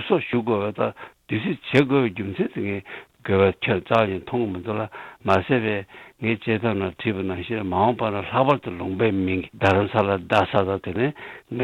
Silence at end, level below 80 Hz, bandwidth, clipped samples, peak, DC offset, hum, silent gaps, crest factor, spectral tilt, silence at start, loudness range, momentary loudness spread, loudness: 0 s; -56 dBFS; 11.5 kHz; under 0.1%; -4 dBFS; under 0.1%; none; none; 20 dB; -7.5 dB/octave; 0 s; 3 LU; 9 LU; -23 LUFS